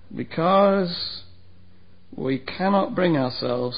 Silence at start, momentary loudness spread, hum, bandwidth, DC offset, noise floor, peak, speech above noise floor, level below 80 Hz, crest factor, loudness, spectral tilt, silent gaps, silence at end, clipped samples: 0.1 s; 13 LU; none; 5.2 kHz; 0.7%; -54 dBFS; -6 dBFS; 32 dB; -56 dBFS; 16 dB; -22 LUFS; -11 dB/octave; none; 0 s; under 0.1%